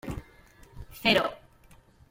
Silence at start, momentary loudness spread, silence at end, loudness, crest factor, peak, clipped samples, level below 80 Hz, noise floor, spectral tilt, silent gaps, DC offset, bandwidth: 0.05 s; 24 LU; 0.75 s; -26 LUFS; 24 dB; -8 dBFS; under 0.1%; -50 dBFS; -57 dBFS; -4.5 dB/octave; none; under 0.1%; 16.5 kHz